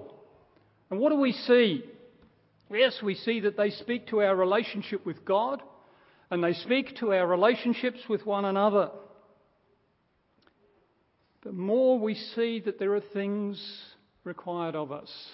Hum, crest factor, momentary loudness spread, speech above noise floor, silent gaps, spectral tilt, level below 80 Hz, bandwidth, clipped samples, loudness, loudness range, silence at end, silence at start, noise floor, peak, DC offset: none; 20 dB; 14 LU; 44 dB; none; -9.5 dB/octave; -78 dBFS; 5.8 kHz; under 0.1%; -28 LUFS; 5 LU; 0 s; 0 s; -71 dBFS; -10 dBFS; under 0.1%